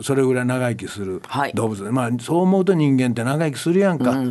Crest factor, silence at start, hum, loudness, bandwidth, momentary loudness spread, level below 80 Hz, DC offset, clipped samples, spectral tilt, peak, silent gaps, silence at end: 14 dB; 0 s; none; -20 LUFS; 12.5 kHz; 8 LU; -56 dBFS; under 0.1%; under 0.1%; -6.5 dB/octave; -4 dBFS; none; 0 s